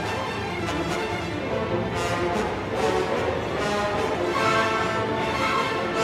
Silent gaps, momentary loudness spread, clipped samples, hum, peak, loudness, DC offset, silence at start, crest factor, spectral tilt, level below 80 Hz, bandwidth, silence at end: none; 6 LU; under 0.1%; none; -10 dBFS; -25 LUFS; under 0.1%; 0 s; 16 dB; -5 dB/octave; -44 dBFS; 16 kHz; 0 s